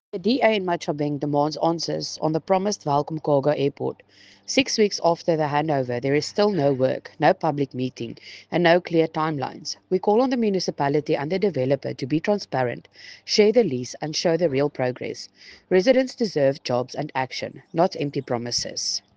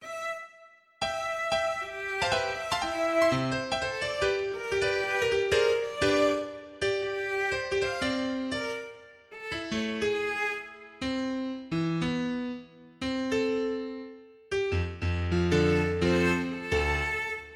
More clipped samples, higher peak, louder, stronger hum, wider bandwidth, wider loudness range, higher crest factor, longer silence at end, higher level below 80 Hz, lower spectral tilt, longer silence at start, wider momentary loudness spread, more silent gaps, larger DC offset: neither; first, -4 dBFS vs -12 dBFS; first, -23 LUFS vs -29 LUFS; neither; second, 9.8 kHz vs 15.5 kHz; second, 2 LU vs 5 LU; about the same, 20 dB vs 16 dB; first, 0.2 s vs 0 s; second, -64 dBFS vs -48 dBFS; about the same, -5 dB/octave vs -5 dB/octave; first, 0.15 s vs 0 s; about the same, 10 LU vs 11 LU; neither; neither